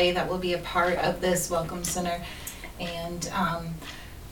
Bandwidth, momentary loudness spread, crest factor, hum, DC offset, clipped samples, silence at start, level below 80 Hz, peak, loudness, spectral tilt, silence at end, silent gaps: 19 kHz; 13 LU; 18 dB; none; 0.2%; under 0.1%; 0 s; -46 dBFS; -10 dBFS; -29 LUFS; -4 dB/octave; 0 s; none